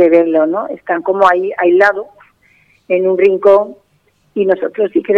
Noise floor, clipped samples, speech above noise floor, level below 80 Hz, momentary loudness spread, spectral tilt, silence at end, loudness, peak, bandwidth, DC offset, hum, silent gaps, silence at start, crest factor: -57 dBFS; under 0.1%; 45 dB; -58 dBFS; 11 LU; -7 dB/octave; 0 s; -13 LUFS; 0 dBFS; 7.2 kHz; under 0.1%; none; none; 0 s; 12 dB